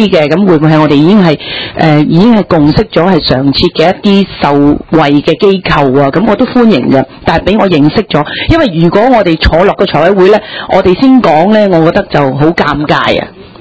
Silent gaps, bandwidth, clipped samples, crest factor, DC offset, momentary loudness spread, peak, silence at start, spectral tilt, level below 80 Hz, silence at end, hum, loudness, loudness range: none; 8 kHz; 5%; 6 dB; 0.6%; 5 LU; 0 dBFS; 0 s; -7.5 dB/octave; -26 dBFS; 0.15 s; none; -7 LUFS; 1 LU